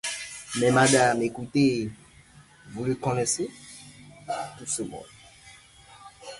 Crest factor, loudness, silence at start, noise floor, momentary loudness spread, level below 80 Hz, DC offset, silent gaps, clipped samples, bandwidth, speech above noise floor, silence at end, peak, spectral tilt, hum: 20 dB; -25 LUFS; 0.05 s; -53 dBFS; 24 LU; -58 dBFS; under 0.1%; none; under 0.1%; 11.5 kHz; 28 dB; 0 s; -8 dBFS; -4 dB/octave; none